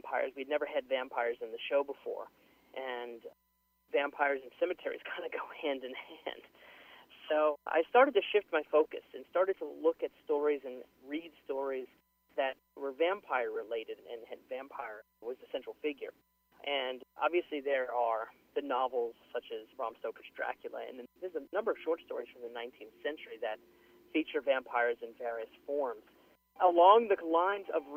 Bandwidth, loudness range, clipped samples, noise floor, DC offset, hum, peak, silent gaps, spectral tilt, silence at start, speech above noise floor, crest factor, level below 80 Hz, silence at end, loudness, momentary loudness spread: 15.5 kHz; 9 LU; under 0.1%; -57 dBFS; under 0.1%; none; -10 dBFS; none; -4.5 dB/octave; 0.05 s; 23 dB; 24 dB; -80 dBFS; 0 s; -34 LUFS; 15 LU